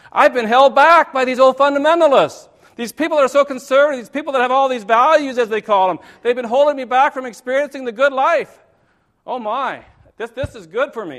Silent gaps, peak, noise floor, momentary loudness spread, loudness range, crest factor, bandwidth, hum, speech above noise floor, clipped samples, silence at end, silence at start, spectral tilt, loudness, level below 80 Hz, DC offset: none; 0 dBFS; -60 dBFS; 14 LU; 7 LU; 16 dB; 14 kHz; none; 45 dB; under 0.1%; 0 s; 0.15 s; -4 dB/octave; -15 LUFS; -52 dBFS; under 0.1%